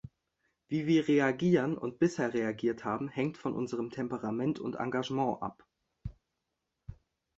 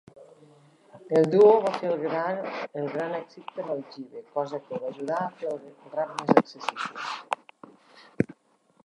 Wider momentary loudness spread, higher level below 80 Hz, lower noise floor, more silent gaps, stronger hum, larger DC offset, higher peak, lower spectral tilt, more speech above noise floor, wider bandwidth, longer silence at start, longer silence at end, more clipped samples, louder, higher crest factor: first, 20 LU vs 15 LU; first, -62 dBFS vs -72 dBFS; first, -85 dBFS vs -65 dBFS; neither; neither; neither; second, -14 dBFS vs -2 dBFS; about the same, -7 dB/octave vs -6.5 dB/octave; first, 54 dB vs 39 dB; second, 8 kHz vs 11 kHz; second, 0.05 s vs 0.2 s; second, 0.45 s vs 0.6 s; neither; second, -32 LUFS vs -27 LUFS; second, 20 dB vs 26 dB